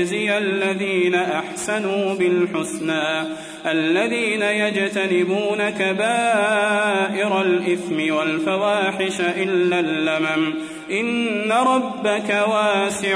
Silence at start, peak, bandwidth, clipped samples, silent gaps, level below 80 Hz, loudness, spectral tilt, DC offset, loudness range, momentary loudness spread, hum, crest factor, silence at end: 0 s; -6 dBFS; 11 kHz; under 0.1%; none; -66 dBFS; -20 LUFS; -4 dB/octave; under 0.1%; 2 LU; 5 LU; none; 14 dB; 0 s